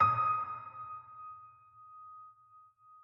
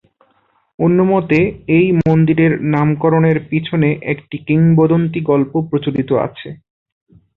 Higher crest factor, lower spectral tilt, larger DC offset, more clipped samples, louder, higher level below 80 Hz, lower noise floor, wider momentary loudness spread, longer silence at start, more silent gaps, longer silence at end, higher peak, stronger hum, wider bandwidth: first, 22 dB vs 14 dB; second, -7 dB/octave vs -10.5 dB/octave; neither; neither; second, -35 LUFS vs -15 LUFS; second, -78 dBFS vs -48 dBFS; about the same, -62 dBFS vs -59 dBFS; first, 25 LU vs 7 LU; second, 0 s vs 0.8 s; neither; second, 0.05 s vs 0.8 s; second, -16 dBFS vs -2 dBFS; neither; first, 5.6 kHz vs 4.1 kHz